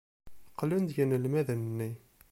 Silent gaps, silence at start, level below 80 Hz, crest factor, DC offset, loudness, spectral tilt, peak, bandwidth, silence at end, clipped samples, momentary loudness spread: none; 0.25 s; -64 dBFS; 16 dB; under 0.1%; -32 LUFS; -8 dB/octave; -16 dBFS; 16.5 kHz; 0.35 s; under 0.1%; 13 LU